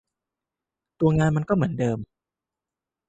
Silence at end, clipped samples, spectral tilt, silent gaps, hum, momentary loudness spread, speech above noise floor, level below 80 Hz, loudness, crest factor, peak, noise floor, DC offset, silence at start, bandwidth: 1.05 s; under 0.1%; -8.5 dB/octave; none; none; 6 LU; 67 dB; -50 dBFS; -24 LUFS; 18 dB; -8 dBFS; -89 dBFS; under 0.1%; 1 s; 8.2 kHz